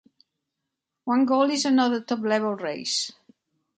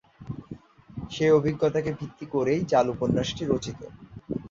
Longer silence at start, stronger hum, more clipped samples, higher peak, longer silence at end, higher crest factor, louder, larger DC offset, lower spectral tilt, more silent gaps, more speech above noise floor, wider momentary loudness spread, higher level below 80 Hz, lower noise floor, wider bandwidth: first, 1.05 s vs 0.2 s; neither; neither; about the same, -8 dBFS vs -8 dBFS; first, 0.65 s vs 0.05 s; about the same, 16 dB vs 18 dB; about the same, -24 LUFS vs -26 LUFS; neither; second, -3 dB/octave vs -6.5 dB/octave; neither; first, 60 dB vs 20 dB; second, 8 LU vs 21 LU; second, -76 dBFS vs -52 dBFS; first, -83 dBFS vs -45 dBFS; first, 9.4 kHz vs 7.6 kHz